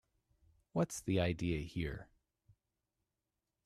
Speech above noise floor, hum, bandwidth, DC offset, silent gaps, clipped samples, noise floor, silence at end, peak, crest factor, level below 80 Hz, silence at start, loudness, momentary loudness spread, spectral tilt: 53 dB; none; 14 kHz; under 0.1%; none; under 0.1%; -89 dBFS; 1.6 s; -20 dBFS; 20 dB; -58 dBFS; 0.75 s; -38 LUFS; 8 LU; -6 dB/octave